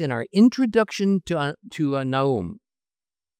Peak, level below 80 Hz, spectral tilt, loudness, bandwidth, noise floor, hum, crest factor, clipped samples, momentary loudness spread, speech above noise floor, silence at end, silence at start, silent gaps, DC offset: -6 dBFS; -60 dBFS; -6.5 dB/octave; -22 LUFS; 9.8 kHz; under -90 dBFS; none; 16 dB; under 0.1%; 10 LU; over 68 dB; 0.85 s; 0 s; none; under 0.1%